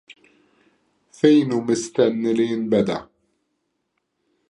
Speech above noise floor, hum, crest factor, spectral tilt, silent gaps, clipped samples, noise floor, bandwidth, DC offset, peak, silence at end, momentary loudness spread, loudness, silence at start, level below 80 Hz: 56 dB; none; 20 dB; -6 dB/octave; none; under 0.1%; -74 dBFS; 11 kHz; under 0.1%; -2 dBFS; 1.45 s; 6 LU; -20 LUFS; 1.25 s; -64 dBFS